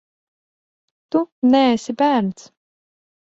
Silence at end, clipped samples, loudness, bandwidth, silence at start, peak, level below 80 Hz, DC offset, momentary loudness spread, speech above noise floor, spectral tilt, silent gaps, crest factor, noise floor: 1 s; under 0.1%; -18 LUFS; 8 kHz; 1.15 s; -4 dBFS; -64 dBFS; under 0.1%; 8 LU; over 73 dB; -5.5 dB/octave; 1.32-1.42 s; 18 dB; under -90 dBFS